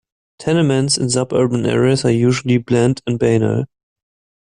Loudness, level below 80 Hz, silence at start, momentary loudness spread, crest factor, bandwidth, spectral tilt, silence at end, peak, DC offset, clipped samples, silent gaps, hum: -16 LUFS; -48 dBFS; 0.4 s; 5 LU; 14 dB; 11 kHz; -5.5 dB/octave; 0.85 s; -2 dBFS; under 0.1%; under 0.1%; none; none